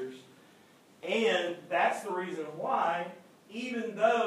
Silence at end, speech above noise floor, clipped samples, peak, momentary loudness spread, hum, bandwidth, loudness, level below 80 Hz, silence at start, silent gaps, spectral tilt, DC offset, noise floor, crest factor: 0 s; 29 dB; under 0.1%; -14 dBFS; 15 LU; none; 14.5 kHz; -31 LUFS; under -90 dBFS; 0 s; none; -4 dB/octave; under 0.1%; -60 dBFS; 18 dB